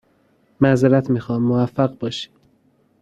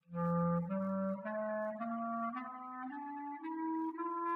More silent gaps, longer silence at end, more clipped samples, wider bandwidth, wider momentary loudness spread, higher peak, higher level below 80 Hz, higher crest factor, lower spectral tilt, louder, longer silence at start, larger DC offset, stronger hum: neither; first, 0.75 s vs 0 s; neither; first, 9 kHz vs 3.8 kHz; about the same, 12 LU vs 10 LU; first, -2 dBFS vs -26 dBFS; first, -54 dBFS vs -76 dBFS; about the same, 18 dB vs 14 dB; second, -7.5 dB/octave vs -11 dB/octave; first, -19 LUFS vs -39 LUFS; first, 0.6 s vs 0.1 s; neither; neither